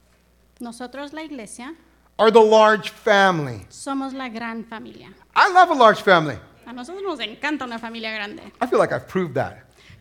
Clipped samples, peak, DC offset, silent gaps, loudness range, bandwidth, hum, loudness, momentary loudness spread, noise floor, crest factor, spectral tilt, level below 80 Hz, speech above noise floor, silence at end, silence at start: under 0.1%; 0 dBFS; under 0.1%; none; 7 LU; 16.5 kHz; none; -19 LUFS; 23 LU; -58 dBFS; 20 dB; -4.5 dB/octave; -60 dBFS; 38 dB; 0.45 s; 0.6 s